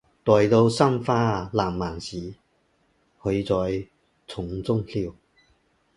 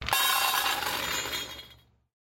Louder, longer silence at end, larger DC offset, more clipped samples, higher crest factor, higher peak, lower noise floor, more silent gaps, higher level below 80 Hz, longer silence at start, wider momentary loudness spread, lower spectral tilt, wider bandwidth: first, -24 LUFS vs -27 LUFS; first, 0.85 s vs 0.5 s; neither; neither; about the same, 22 dB vs 22 dB; first, -2 dBFS vs -8 dBFS; first, -67 dBFS vs -56 dBFS; neither; first, -48 dBFS vs -54 dBFS; first, 0.25 s vs 0 s; first, 16 LU vs 13 LU; first, -7 dB/octave vs 0 dB/octave; second, 11.5 kHz vs 16.5 kHz